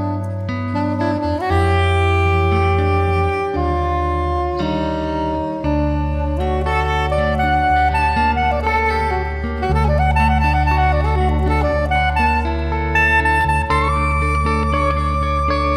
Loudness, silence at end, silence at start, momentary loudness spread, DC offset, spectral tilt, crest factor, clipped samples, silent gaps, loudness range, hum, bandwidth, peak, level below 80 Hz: -17 LUFS; 0 s; 0 s; 5 LU; under 0.1%; -7 dB/octave; 14 dB; under 0.1%; none; 3 LU; none; 10.5 kHz; -4 dBFS; -22 dBFS